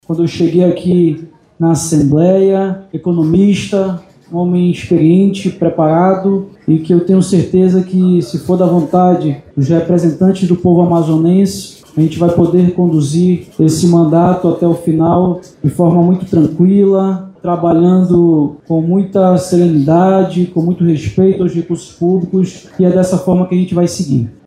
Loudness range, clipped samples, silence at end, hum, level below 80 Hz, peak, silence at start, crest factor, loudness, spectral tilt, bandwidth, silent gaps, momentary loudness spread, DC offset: 2 LU; under 0.1%; 0.15 s; none; -44 dBFS; 0 dBFS; 0.1 s; 10 dB; -12 LUFS; -8 dB/octave; 12.5 kHz; none; 7 LU; under 0.1%